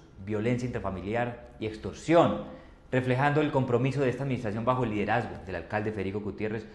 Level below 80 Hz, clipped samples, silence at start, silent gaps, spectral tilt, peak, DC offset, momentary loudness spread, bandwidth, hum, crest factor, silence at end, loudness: -52 dBFS; under 0.1%; 0 s; none; -7.5 dB/octave; -10 dBFS; under 0.1%; 11 LU; 10 kHz; none; 20 dB; 0 s; -29 LUFS